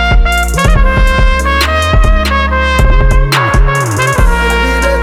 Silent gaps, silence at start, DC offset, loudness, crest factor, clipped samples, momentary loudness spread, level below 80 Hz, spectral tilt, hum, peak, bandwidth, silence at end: none; 0 s; under 0.1%; -10 LUFS; 8 dB; under 0.1%; 1 LU; -10 dBFS; -5 dB/octave; none; 0 dBFS; 15 kHz; 0 s